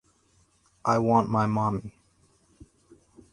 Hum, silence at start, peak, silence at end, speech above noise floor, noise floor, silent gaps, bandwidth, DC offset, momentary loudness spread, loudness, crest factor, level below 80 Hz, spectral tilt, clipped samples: none; 0.85 s; -6 dBFS; 1.4 s; 41 dB; -65 dBFS; none; 11 kHz; under 0.1%; 12 LU; -25 LUFS; 22 dB; -58 dBFS; -8 dB/octave; under 0.1%